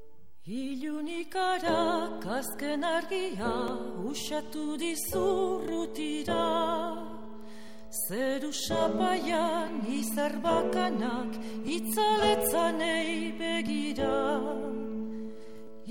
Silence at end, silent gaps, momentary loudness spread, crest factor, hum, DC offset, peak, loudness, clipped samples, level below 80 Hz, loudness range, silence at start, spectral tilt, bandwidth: 0 s; none; 10 LU; 16 dB; none; 0.9%; -14 dBFS; -31 LUFS; under 0.1%; -58 dBFS; 3 LU; 0.45 s; -3.5 dB/octave; 16.5 kHz